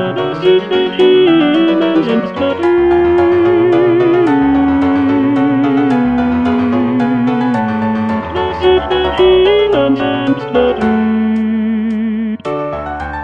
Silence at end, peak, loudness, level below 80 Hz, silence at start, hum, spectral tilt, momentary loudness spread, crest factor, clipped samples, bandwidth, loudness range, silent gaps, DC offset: 0 s; 0 dBFS; -12 LUFS; -36 dBFS; 0 s; none; -7.5 dB/octave; 7 LU; 12 dB; under 0.1%; 6 kHz; 3 LU; none; 0.3%